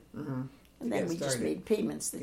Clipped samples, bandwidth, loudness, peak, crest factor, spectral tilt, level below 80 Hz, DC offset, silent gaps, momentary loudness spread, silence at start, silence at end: under 0.1%; 16.5 kHz; -33 LUFS; -16 dBFS; 18 dB; -4.5 dB/octave; -64 dBFS; under 0.1%; none; 9 LU; 0 s; 0 s